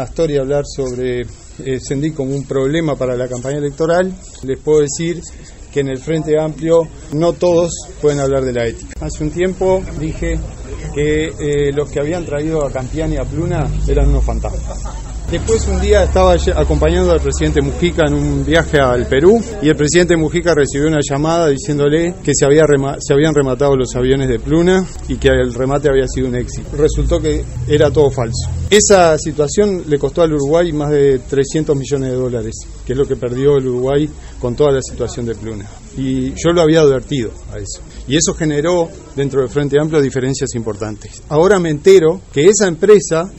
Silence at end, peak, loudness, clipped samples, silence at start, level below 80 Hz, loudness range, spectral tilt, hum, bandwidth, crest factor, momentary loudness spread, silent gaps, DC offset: 0 s; 0 dBFS; -15 LUFS; under 0.1%; 0 s; -26 dBFS; 5 LU; -5.5 dB/octave; none; 10.5 kHz; 14 dB; 12 LU; none; under 0.1%